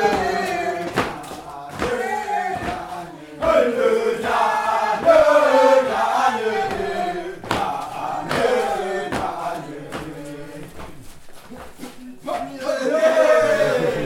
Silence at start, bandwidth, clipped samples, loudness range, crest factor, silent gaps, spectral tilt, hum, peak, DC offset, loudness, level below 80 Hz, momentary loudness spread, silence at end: 0 s; 16.5 kHz; under 0.1%; 13 LU; 18 dB; none; -4.5 dB/octave; none; -2 dBFS; under 0.1%; -20 LUFS; -48 dBFS; 20 LU; 0 s